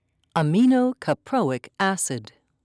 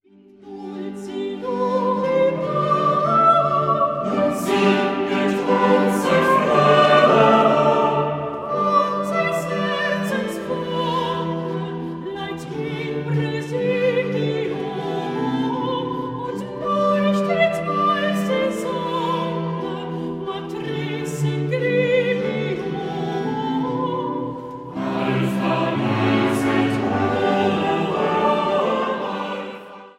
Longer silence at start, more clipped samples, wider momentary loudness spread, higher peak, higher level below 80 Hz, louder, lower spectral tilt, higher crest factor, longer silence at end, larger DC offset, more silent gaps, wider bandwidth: about the same, 0.35 s vs 0.4 s; neither; second, 9 LU vs 12 LU; second, -8 dBFS vs 0 dBFS; second, -68 dBFS vs -58 dBFS; second, -23 LUFS vs -20 LUFS; about the same, -5.5 dB/octave vs -6.5 dB/octave; second, 14 dB vs 20 dB; first, 0.4 s vs 0.05 s; neither; neither; second, 11 kHz vs 16 kHz